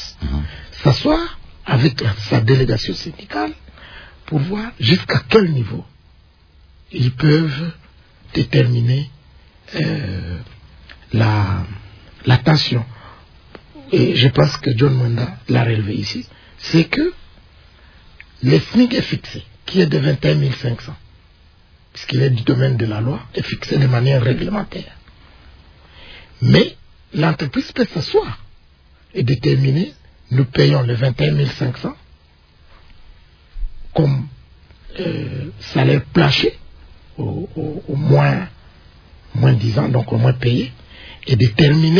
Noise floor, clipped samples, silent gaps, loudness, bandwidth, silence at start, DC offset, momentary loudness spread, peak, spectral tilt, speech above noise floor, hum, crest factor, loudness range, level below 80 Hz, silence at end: -50 dBFS; under 0.1%; none; -17 LUFS; 5.4 kHz; 0 s; under 0.1%; 17 LU; 0 dBFS; -7.5 dB/octave; 34 dB; none; 18 dB; 4 LU; -38 dBFS; 0 s